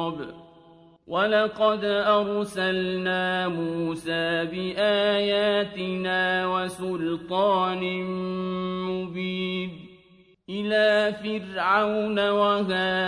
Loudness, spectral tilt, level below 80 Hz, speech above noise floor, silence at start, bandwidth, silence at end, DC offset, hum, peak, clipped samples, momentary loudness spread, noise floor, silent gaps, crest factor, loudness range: -25 LUFS; -5.5 dB/octave; -62 dBFS; 32 dB; 0 s; 11 kHz; 0 s; under 0.1%; none; -8 dBFS; under 0.1%; 8 LU; -57 dBFS; none; 18 dB; 3 LU